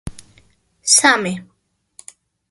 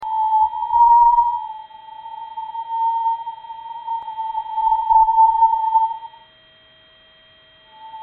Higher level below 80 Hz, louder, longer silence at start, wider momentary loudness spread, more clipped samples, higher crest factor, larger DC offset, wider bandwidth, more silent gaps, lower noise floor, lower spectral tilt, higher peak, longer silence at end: about the same, -48 dBFS vs -50 dBFS; first, -14 LUFS vs -17 LUFS; about the same, 0.05 s vs 0 s; about the same, 20 LU vs 21 LU; neither; first, 20 dB vs 14 dB; neither; first, 12 kHz vs 4 kHz; neither; first, -56 dBFS vs -51 dBFS; first, -1 dB/octave vs 0.5 dB/octave; first, 0 dBFS vs -6 dBFS; first, 1.05 s vs 0 s